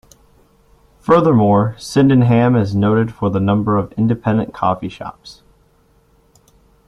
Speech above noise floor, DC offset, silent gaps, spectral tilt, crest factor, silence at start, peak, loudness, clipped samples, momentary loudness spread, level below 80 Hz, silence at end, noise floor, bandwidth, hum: 40 dB; under 0.1%; none; -8 dB/octave; 16 dB; 1.1 s; 0 dBFS; -15 LUFS; under 0.1%; 10 LU; -48 dBFS; 1.55 s; -55 dBFS; 12 kHz; none